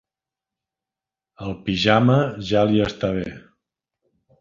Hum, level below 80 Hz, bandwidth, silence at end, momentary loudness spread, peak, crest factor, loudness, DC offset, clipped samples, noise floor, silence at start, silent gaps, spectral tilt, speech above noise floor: none; -48 dBFS; 7.4 kHz; 1 s; 16 LU; -2 dBFS; 22 dB; -20 LUFS; under 0.1%; under 0.1%; -89 dBFS; 1.4 s; none; -7 dB/octave; 69 dB